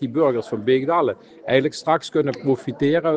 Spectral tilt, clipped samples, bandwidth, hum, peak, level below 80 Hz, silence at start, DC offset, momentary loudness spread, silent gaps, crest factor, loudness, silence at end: -6.5 dB/octave; under 0.1%; 9.4 kHz; none; -4 dBFS; -64 dBFS; 0 s; under 0.1%; 4 LU; none; 16 dB; -21 LUFS; 0 s